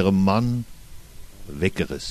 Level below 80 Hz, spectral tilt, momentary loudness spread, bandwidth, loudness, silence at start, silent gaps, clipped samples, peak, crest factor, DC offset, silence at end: -42 dBFS; -6.5 dB/octave; 20 LU; 13.5 kHz; -23 LUFS; 0 s; none; under 0.1%; -6 dBFS; 18 dB; under 0.1%; 0 s